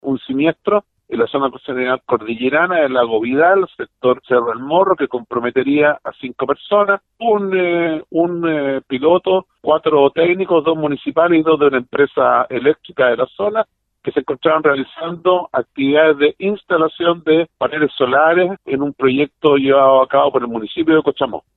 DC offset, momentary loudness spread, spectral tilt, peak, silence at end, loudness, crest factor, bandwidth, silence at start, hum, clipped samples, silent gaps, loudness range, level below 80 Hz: under 0.1%; 8 LU; -9 dB/octave; 0 dBFS; 0.15 s; -16 LUFS; 16 dB; 4.2 kHz; 0.05 s; none; under 0.1%; none; 3 LU; -58 dBFS